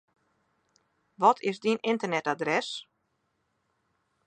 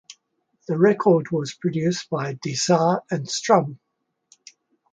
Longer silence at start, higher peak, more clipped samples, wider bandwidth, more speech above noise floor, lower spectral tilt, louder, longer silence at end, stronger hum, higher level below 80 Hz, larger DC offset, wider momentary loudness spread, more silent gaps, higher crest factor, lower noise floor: first, 1.2 s vs 0.1 s; second, -8 dBFS vs -2 dBFS; neither; about the same, 9.6 kHz vs 9.4 kHz; about the same, 49 dB vs 49 dB; about the same, -4.5 dB/octave vs -5 dB/octave; second, -27 LUFS vs -21 LUFS; first, 1.45 s vs 1.2 s; neither; second, -84 dBFS vs -68 dBFS; neither; about the same, 7 LU vs 9 LU; neither; about the same, 24 dB vs 20 dB; first, -76 dBFS vs -70 dBFS